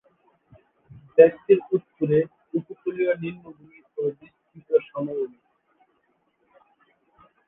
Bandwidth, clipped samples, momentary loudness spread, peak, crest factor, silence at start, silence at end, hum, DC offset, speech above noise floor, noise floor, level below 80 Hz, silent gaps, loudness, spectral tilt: 3.8 kHz; under 0.1%; 16 LU; -2 dBFS; 24 dB; 1.15 s; 2.2 s; none; under 0.1%; 47 dB; -69 dBFS; -66 dBFS; none; -23 LUFS; -11 dB/octave